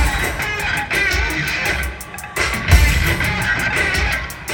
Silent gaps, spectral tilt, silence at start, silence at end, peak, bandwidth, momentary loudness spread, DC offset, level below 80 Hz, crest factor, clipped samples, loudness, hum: none; -3.5 dB/octave; 0 s; 0 s; 0 dBFS; 19 kHz; 8 LU; under 0.1%; -22 dBFS; 18 dB; under 0.1%; -17 LUFS; none